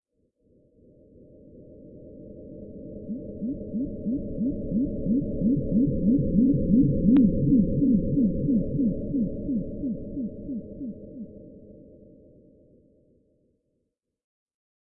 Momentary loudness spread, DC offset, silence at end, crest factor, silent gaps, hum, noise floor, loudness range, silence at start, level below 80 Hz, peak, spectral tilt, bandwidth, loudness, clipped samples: 21 LU; under 0.1%; 3.1 s; 18 dB; none; none; -79 dBFS; 19 LU; 1.55 s; -42 dBFS; -10 dBFS; -14.5 dB/octave; 3.7 kHz; -25 LUFS; under 0.1%